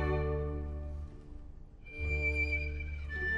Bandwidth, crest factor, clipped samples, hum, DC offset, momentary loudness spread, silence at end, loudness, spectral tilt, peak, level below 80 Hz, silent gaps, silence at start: 7.6 kHz; 14 dB; under 0.1%; none; under 0.1%; 21 LU; 0 s; -36 LUFS; -7.5 dB/octave; -22 dBFS; -38 dBFS; none; 0 s